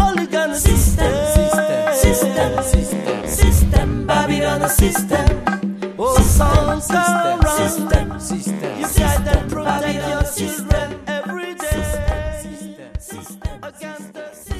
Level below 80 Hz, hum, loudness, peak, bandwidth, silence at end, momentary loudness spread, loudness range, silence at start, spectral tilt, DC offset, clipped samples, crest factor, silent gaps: -22 dBFS; none; -18 LUFS; -2 dBFS; 14 kHz; 0 s; 16 LU; 7 LU; 0 s; -5 dB/octave; under 0.1%; under 0.1%; 16 dB; none